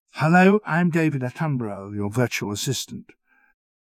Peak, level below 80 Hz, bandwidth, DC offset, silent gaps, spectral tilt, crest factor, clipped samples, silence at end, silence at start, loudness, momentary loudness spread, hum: -4 dBFS; -58 dBFS; 16 kHz; under 0.1%; none; -5.5 dB/octave; 18 dB; under 0.1%; 0.85 s; 0.15 s; -22 LUFS; 14 LU; none